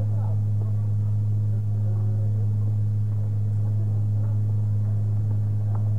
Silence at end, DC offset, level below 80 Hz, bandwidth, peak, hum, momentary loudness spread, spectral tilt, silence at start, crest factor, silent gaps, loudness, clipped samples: 0 s; 2%; -50 dBFS; 1.6 kHz; -16 dBFS; 50 Hz at -45 dBFS; 1 LU; -10.5 dB/octave; 0 s; 6 dB; none; -25 LUFS; under 0.1%